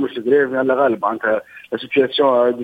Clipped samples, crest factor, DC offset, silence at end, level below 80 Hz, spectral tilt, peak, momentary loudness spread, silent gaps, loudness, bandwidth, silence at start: under 0.1%; 14 dB; under 0.1%; 0 s; -64 dBFS; -6.5 dB/octave; -2 dBFS; 8 LU; none; -17 LUFS; 4.9 kHz; 0 s